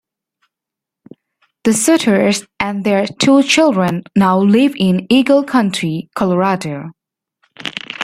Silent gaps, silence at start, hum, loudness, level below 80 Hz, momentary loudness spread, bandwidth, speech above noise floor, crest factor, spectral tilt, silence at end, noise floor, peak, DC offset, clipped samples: none; 1.65 s; none; -14 LUFS; -54 dBFS; 13 LU; 15.5 kHz; 71 dB; 14 dB; -5 dB/octave; 0 s; -84 dBFS; 0 dBFS; under 0.1%; under 0.1%